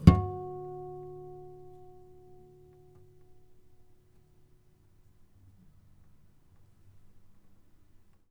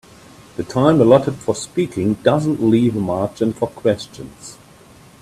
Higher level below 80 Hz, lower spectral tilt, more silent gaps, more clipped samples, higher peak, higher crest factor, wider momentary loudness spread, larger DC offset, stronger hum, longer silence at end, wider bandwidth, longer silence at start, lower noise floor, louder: first, -44 dBFS vs -52 dBFS; first, -9 dB/octave vs -7 dB/octave; neither; neither; about the same, -2 dBFS vs 0 dBFS; first, 32 dB vs 18 dB; first, 25 LU vs 20 LU; neither; neither; first, 6.6 s vs 0.7 s; second, 10 kHz vs 13.5 kHz; second, 0 s vs 0.6 s; first, -61 dBFS vs -45 dBFS; second, -33 LUFS vs -17 LUFS